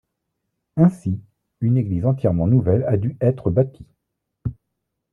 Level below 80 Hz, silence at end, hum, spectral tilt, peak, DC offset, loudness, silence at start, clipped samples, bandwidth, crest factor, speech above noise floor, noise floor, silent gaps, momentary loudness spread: -48 dBFS; 0.6 s; none; -11.5 dB/octave; -4 dBFS; under 0.1%; -20 LUFS; 0.75 s; under 0.1%; 3 kHz; 16 dB; 60 dB; -78 dBFS; none; 14 LU